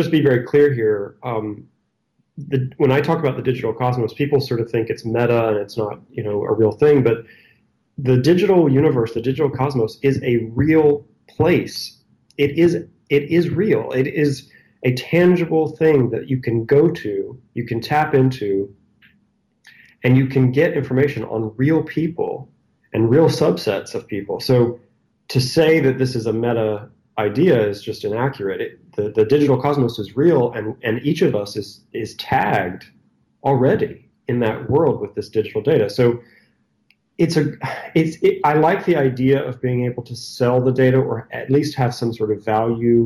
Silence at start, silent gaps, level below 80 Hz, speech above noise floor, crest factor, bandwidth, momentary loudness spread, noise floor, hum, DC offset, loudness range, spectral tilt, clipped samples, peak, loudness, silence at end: 0 s; none; -54 dBFS; 50 dB; 14 dB; 14.5 kHz; 11 LU; -67 dBFS; none; under 0.1%; 3 LU; -7.5 dB/octave; under 0.1%; -4 dBFS; -18 LUFS; 0 s